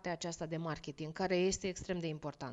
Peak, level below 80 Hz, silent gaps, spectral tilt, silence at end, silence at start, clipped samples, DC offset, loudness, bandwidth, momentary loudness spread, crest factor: -22 dBFS; -60 dBFS; none; -4.5 dB/octave; 0 s; 0.05 s; under 0.1%; under 0.1%; -38 LUFS; 9.2 kHz; 10 LU; 16 dB